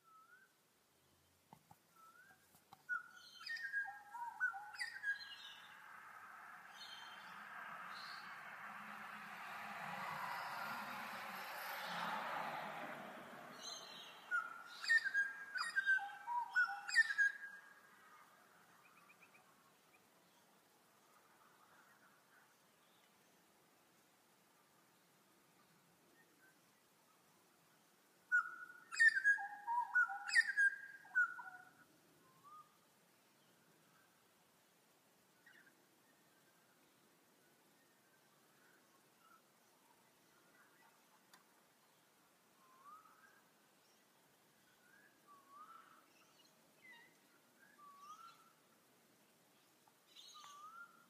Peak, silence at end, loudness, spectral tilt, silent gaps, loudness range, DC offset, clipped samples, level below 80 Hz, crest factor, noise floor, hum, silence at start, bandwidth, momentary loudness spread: -22 dBFS; 0.25 s; -41 LUFS; -0.5 dB/octave; none; 26 LU; under 0.1%; under 0.1%; under -90 dBFS; 26 dB; -76 dBFS; none; 0.1 s; 15.5 kHz; 25 LU